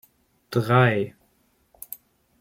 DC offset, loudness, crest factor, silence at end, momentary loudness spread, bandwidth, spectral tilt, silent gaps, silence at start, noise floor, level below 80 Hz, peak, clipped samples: under 0.1%; -22 LUFS; 20 dB; 1.3 s; 21 LU; 16.5 kHz; -7 dB/octave; none; 0.5 s; -65 dBFS; -62 dBFS; -6 dBFS; under 0.1%